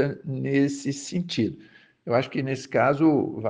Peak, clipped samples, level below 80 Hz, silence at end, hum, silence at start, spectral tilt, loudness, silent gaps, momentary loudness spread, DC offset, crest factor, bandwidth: -8 dBFS; under 0.1%; -64 dBFS; 0 s; none; 0 s; -6 dB/octave; -25 LUFS; none; 10 LU; under 0.1%; 16 dB; 9.8 kHz